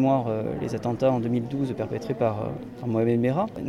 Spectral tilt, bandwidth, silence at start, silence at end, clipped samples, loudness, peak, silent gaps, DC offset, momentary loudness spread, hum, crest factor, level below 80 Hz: -8.5 dB/octave; 12.5 kHz; 0 s; 0 s; under 0.1%; -26 LUFS; -10 dBFS; none; under 0.1%; 7 LU; none; 16 dB; -54 dBFS